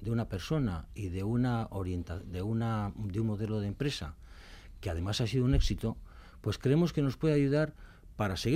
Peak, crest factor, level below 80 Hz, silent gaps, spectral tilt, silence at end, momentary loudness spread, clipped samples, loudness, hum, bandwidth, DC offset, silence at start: -16 dBFS; 16 dB; -42 dBFS; none; -7 dB/octave; 0 s; 12 LU; under 0.1%; -33 LUFS; none; 15 kHz; under 0.1%; 0 s